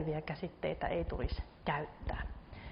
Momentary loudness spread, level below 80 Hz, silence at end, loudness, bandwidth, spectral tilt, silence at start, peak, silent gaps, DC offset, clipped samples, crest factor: 6 LU; -46 dBFS; 0 s; -40 LUFS; 5.4 kHz; -5 dB/octave; 0 s; -22 dBFS; none; under 0.1%; under 0.1%; 16 dB